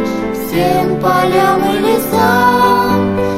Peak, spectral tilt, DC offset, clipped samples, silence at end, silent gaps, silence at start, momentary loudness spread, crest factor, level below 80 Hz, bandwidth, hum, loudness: 0 dBFS; -5.5 dB/octave; under 0.1%; under 0.1%; 0 s; none; 0 s; 6 LU; 12 dB; -38 dBFS; 16.5 kHz; none; -12 LUFS